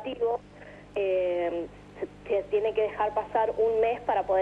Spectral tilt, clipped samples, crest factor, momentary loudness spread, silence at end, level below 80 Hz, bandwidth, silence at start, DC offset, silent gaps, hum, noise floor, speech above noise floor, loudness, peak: -6.5 dB/octave; under 0.1%; 14 dB; 14 LU; 0 s; -56 dBFS; 7.8 kHz; 0 s; under 0.1%; none; 50 Hz at -50 dBFS; -48 dBFS; 22 dB; -28 LUFS; -14 dBFS